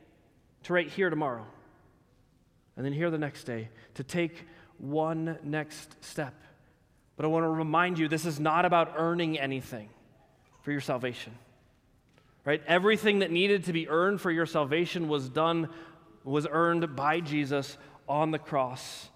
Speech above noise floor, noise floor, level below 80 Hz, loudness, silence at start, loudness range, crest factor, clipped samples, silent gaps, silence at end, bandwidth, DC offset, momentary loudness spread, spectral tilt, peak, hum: 36 dB; -65 dBFS; -70 dBFS; -29 LUFS; 0.65 s; 8 LU; 20 dB; under 0.1%; none; 0.1 s; 15.5 kHz; under 0.1%; 16 LU; -6 dB/octave; -10 dBFS; none